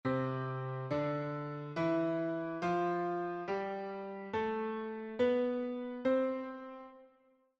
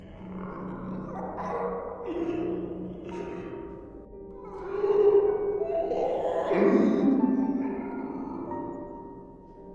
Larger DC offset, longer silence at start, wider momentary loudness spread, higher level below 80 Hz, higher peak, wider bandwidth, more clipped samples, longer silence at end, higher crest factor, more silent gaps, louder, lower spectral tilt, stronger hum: neither; about the same, 0.05 s vs 0 s; second, 9 LU vs 20 LU; second, -74 dBFS vs -54 dBFS; second, -22 dBFS vs -10 dBFS; about the same, 7.6 kHz vs 7.2 kHz; neither; first, 0.5 s vs 0 s; about the same, 16 dB vs 18 dB; neither; second, -36 LUFS vs -28 LUFS; about the same, -8 dB/octave vs -9 dB/octave; neither